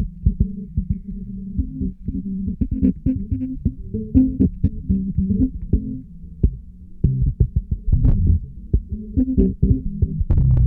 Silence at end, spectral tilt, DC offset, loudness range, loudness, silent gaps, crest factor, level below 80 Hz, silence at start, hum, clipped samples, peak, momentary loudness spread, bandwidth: 0 s; -14.5 dB/octave; under 0.1%; 4 LU; -22 LUFS; none; 18 dB; -24 dBFS; 0 s; none; under 0.1%; -2 dBFS; 10 LU; 1.8 kHz